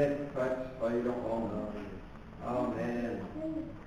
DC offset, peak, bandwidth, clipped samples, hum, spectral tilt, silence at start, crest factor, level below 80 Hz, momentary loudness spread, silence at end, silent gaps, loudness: under 0.1%; -18 dBFS; 11 kHz; under 0.1%; none; -8 dB/octave; 0 s; 16 dB; -54 dBFS; 11 LU; 0 s; none; -36 LUFS